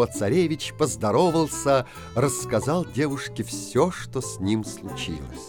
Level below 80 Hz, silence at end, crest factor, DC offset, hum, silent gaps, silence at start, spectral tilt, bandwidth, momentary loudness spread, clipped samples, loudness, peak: -48 dBFS; 0 s; 16 dB; 0.1%; none; none; 0 s; -5 dB/octave; 18.5 kHz; 10 LU; under 0.1%; -25 LUFS; -8 dBFS